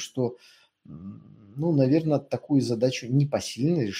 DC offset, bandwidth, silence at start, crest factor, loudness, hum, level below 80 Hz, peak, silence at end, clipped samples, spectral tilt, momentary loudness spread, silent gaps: under 0.1%; 12.5 kHz; 0 s; 16 dB; -25 LUFS; none; -64 dBFS; -10 dBFS; 0 s; under 0.1%; -6.5 dB/octave; 20 LU; none